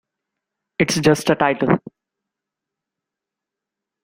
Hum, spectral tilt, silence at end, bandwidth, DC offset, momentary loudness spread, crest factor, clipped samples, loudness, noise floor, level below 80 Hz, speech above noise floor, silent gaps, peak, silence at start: none; -5 dB/octave; 2.25 s; 16 kHz; under 0.1%; 6 LU; 22 dB; under 0.1%; -18 LUFS; -85 dBFS; -54 dBFS; 69 dB; none; -2 dBFS; 0.8 s